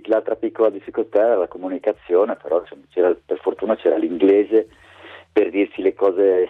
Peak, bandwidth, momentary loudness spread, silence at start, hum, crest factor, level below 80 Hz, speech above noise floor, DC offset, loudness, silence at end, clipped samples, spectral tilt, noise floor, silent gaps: -6 dBFS; 4.1 kHz; 8 LU; 0.05 s; none; 14 dB; -62 dBFS; 24 dB; under 0.1%; -20 LUFS; 0 s; under 0.1%; -7.5 dB/octave; -43 dBFS; none